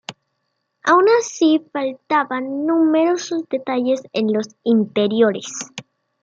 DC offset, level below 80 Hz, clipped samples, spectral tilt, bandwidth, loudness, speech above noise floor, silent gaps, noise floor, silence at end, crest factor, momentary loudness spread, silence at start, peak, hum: under 0.1%; -72 dBFS; under 0.1%; -4.5 dB/octave; 7.8 kHz; -18 LUFS; 55 dB; none; -73 dBFS; 0.4 s; 16 dB; 11 LU; 0.1 s; -4 dBFS; none